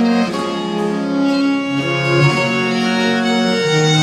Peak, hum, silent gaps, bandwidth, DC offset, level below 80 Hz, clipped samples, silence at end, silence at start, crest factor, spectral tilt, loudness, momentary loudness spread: 0 dBFS; none; none; 12.5 kHz; under 0.1%; -54 dBFS; under 0.1%; 0 s; 0 s; 14 dB; -5 dB/octave; -16 LUFS; 6 LU